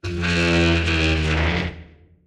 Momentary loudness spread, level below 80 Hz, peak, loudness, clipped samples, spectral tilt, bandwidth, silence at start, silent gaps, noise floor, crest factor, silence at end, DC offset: 6 LU; -30 dBFS; -6 dBFS; -19 LUFS; under 0.1%; -5.5 dB/octave; 10.5 kHz; 0.05 s; none; -44 dBFS; 14 dB; 0.45 s; under 0.1%